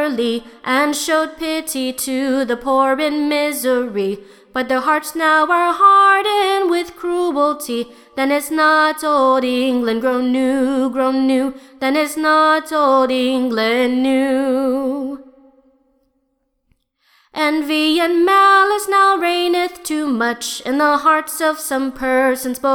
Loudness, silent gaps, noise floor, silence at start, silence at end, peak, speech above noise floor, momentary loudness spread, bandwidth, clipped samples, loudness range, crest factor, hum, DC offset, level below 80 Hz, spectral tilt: -16 LUFS; none; -68 dBFS; 0 s; 0 s; -2 dBFS; 52 dB; 9 LU; 19.5 kHz; under 0.1%; 5 LU; 16 dB; none; under 0.1%; -56 dBFS; -2.5 dB/octave